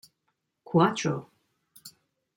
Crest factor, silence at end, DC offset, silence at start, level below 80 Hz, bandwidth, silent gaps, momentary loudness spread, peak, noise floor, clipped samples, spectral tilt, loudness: 24 dB; 0.45 s; under 0.1%; 0.7 s; -70 dBFS; 16.5 kHz; none; 25 LU; -8 dBFS; -79 dBFS; under 0.1%; -6 dB/octave; -26 LUFS